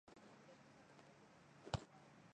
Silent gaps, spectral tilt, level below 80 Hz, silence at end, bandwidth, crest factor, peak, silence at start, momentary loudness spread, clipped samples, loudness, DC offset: none; -5 dB/octave; -68 dBFS; 0 s; 9.6 kHz; 32 dB; -24 dBFS; 0.05 s; 16 LU; under 0.1%; -56 LUFS; under 0.1%